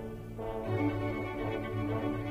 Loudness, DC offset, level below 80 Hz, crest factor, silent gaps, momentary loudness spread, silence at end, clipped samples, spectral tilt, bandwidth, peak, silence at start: -35 LUFS; under 0.1%; -50 dBFS; 14 dB; none; 7 LU; 0 s; under 0.1%; -8.5 dB/octave; 15.5 kHz; -20 dBFS; 0 s